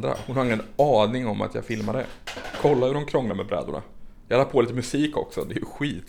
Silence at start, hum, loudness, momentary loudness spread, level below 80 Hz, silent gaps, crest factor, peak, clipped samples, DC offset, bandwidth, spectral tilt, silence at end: 0 s; none; -25 LUFS; 11 LU; -48 dBFS; none; 18 dB; -6 dBFS; under 0.1%; under 0.1%; 19.5 kHz; -6 dB/octave; 0 s